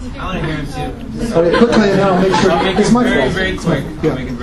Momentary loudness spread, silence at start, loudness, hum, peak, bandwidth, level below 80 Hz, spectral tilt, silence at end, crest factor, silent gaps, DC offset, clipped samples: 12 LU; 0 s; -14 LUFS; none; 0 dBFS; 12.5 kHz; -30 dBFS; -6 dB/octave; 0 s; 14 dB; none; under 0.1%; under 0.1%